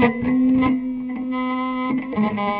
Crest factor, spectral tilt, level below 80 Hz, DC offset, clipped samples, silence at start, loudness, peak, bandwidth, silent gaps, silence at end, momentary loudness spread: 16 dB; -10 dB/octave; -48 dBFS; under 0.1%; under 0.1%; 0 s; -21 LUFS; -4 dBFS; 4.6 kHz; none; 0 s; 8 LU